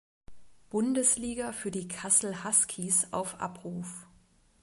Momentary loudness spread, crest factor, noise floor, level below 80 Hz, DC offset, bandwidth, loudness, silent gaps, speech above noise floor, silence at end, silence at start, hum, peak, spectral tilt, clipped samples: 14 LU; 22 dB; -63 dBFS; -62 dBFS; under 0.1%; 12 kHz; -28 LUFS; none; 33 dB; 0.6 s; 0.3 s; none; -10 dBFS; -3 dB/octave; under 0.1%